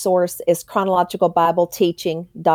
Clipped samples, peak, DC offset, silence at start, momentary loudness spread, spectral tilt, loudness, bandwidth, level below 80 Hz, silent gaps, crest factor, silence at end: under 0.1%; -4 dBFS; under 0.1%; 0 s; 5 LU; -5.5 dB/octave; -19 LUFS; over 20 kHz; -60 dBFS; none; 14 dB; 0 s